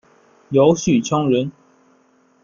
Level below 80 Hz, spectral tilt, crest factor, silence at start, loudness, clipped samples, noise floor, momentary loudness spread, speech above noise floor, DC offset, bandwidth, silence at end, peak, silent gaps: -54 dBFS; -6 dB/octave; 18 dB; 0.5 s; -17 LUFS; under 0.1%; -57 dBFS; 6 LU; 41 dB; under 0.1%; 7.4 kHz; 0.95 s; -2 dBFS; none